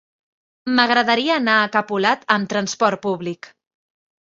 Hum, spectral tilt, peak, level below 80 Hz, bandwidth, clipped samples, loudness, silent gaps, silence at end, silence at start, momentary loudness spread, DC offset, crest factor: none; -3.5 dB/octave; -2 dBFS; -66 dBFS; 7.8 kHz; under 0.1%; -18 LUFS; none; 0.75 s; 0.65 s; 11 LU; under 0.1%; 18 dB